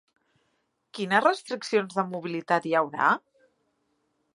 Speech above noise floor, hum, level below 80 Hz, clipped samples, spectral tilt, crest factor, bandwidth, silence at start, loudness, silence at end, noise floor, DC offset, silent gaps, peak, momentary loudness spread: 49 dB; none; -82 dBFS; under 0.1%; -5 dB/octave; 22 dB; 11.5 kHz; 0.95 s; -26 LUFS; 1.15 s; -74 dBFS; under 0.1%; none; -6 dBFS; 10 LU